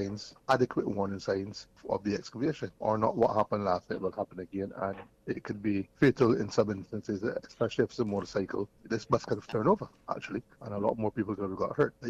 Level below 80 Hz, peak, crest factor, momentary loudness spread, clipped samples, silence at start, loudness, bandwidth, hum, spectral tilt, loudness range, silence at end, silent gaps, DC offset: -60 dBFS; -14 dBFS; 18 dB; 11 LU; under 0.1%; 0 s; -32 LUFS; 10 kHz; none; -7 dB/octave; 2 LU; 0 s; none; under 0.1%